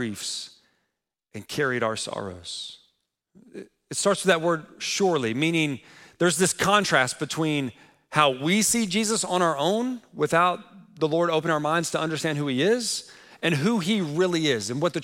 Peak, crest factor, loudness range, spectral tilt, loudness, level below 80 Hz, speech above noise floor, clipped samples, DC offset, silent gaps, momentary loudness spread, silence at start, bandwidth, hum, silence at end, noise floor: -4 dBFS; 20 dB; 7 LU; -3.5 dB/octave; -24 LUFS; -64 dBFS; 56 dB; under 0.1%; under 0.1%; none; 13 LU; 0 s; 16.5 kHz; none; 0 s; -80 dBFS